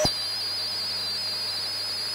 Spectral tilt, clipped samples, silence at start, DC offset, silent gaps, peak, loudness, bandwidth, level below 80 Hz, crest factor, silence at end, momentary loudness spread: -1.5 dB/octave; under 0.1%; 0 s; under 0.1%; none; -10 dBFS; -26 LUFS; 16 kHz; -54 dBFS; 18 dB; 0 s; 1 LU